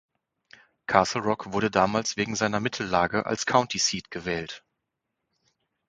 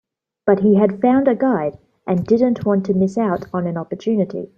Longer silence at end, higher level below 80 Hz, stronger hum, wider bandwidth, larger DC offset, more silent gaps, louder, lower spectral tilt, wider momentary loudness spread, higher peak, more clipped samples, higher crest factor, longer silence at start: first, 1.3 s vs 0.1 s; about the same, -56 dBFS vs -56 dBFS; neither; first, 10 kHz vs 7.4 kHz; neither; neither; second, -26 LUFS vs -18 LUFS; second, -3.5 dB/octave vs -9 dB/octave; about the same, 9 LU vs 9 LU; about the same, -2 dBFS vs -2 dBFS; neither; first, 26 dB vs 16 dB; first, 0.9 s vs 0.45 s